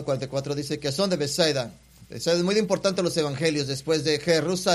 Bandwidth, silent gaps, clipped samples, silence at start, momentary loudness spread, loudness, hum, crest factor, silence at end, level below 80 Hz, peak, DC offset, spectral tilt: 14.5 kHz; none; under 0.1%; 0 s; 7 LU; -25 LUFS; none; 18 dB; 0 s; -58 dBFS; -6 dBFS; under 0.1%; -4.5 dB/octave